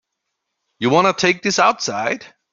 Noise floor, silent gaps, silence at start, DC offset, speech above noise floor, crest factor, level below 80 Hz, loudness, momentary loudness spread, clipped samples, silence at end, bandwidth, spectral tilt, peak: -77 dBFS; none; 0.8 s; under 0.1%; 60 dB; 18 dB; -62 dBFS; -17 LUFS; 8 LU; under 0.1%; 0.25 s; 7.8 kHz; -3.5 dB/octave; 0 dBFS